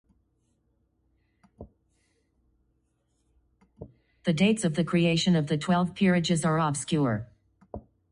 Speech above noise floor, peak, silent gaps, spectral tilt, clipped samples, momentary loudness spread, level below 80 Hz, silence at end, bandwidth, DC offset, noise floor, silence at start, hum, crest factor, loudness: 48 dB; -12 dBFS; none; -5.5 dB/octave; under 0.1%; 15 LU; -58 dBFS; 0.3 s; 10.5 kHz; under 0.1%; -73 dBFS; 1.6 s; none; 16 dB; -26 LUFS